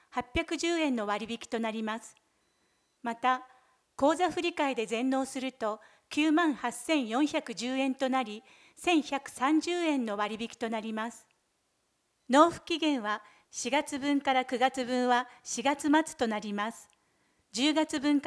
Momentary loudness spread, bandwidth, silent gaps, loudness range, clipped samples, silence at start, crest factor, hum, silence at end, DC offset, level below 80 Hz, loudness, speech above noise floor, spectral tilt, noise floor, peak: 10 LU; 11 kHz; none; 4 LU; under 0.1%; 0.15 s; 22 dB; none; 0 s; under 0.1%; -62 dBFS; -30 LUFS; 46 dB; -3 dB/octave; -76 dBFS; -8 dBFS